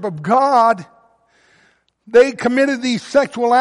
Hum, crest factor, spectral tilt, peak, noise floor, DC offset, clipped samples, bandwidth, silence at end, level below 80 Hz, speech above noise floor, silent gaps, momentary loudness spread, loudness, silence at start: none; 14 dB; -5 dB/octave; -2 dBFS; -57 dBFS; under 0.1%; under 0.1%; 11.5 kHz; 0 s; -62 dBFS; 43 dB; none; 4 LU; -15 LUFS; 0 s